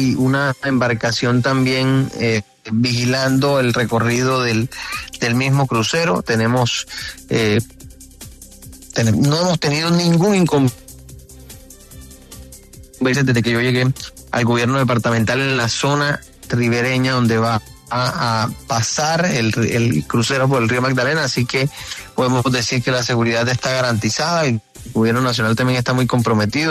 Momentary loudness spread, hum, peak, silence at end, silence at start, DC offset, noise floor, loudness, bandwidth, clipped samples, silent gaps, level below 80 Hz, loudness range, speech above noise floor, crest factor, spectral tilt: 8 LU; none; -4 dBFS; 0 s; 0 s; under 0.1%; -40 dBFS; -17 LUFS; 13.5 kHz; under 0.1%; none; -46 dBFS; 3 LU; 23 dB; 14 dB; -5 dB/octave